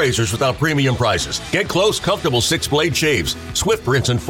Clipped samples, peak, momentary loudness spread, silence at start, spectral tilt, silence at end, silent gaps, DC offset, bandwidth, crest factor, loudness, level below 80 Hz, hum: under 0.1%; -4 dBFS; 4 LU; 0 s; -4 dB/octave; 0 s; none; under 0.1%; 17 kHz; 14 dB; -17 LUFS; -38 dBFS; none